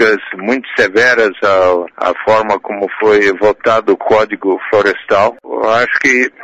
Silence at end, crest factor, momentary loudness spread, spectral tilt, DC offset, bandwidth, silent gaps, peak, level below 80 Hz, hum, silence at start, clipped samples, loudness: 0 s; 10 dB; 7 LU; -4 dB/octave; under 0.1%; 8 kHz; none; -2 dBFS; -50 dBFS; none; 0 s; under 0.1%; -12 LUFS